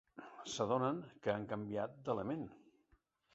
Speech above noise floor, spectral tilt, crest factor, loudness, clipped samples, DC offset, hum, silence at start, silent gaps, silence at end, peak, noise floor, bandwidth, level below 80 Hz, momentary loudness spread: 36 dB; -5 dB/octave; 20 dB; -40 LUFS; under 0.1%; under 0.1%; none; 0.15 s; none; 0.75 s; -22 dBFS; -75 dBFS; 8 kHz; -74 dBFS; 13 LU